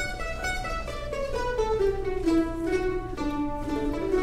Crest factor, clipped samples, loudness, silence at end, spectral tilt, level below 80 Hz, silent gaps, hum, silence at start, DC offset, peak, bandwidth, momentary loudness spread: 14 dB; under 0.1%; -29 LUFS; 0 s; -5.5 dB/octave; -36 dBFS; none; none; 0 s; under 0.1%; -14 dBFS; 15 kHz; 6 LU